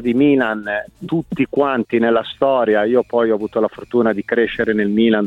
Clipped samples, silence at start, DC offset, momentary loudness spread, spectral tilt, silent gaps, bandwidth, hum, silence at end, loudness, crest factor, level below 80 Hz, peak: under 0.1%; 0 s; under 0.1%; 8 LU; -8 dB/octave; none; 5.2 kHz; none; 0 s; -17 LUFS; 14 dB; -52 dBFS; -2 dBFS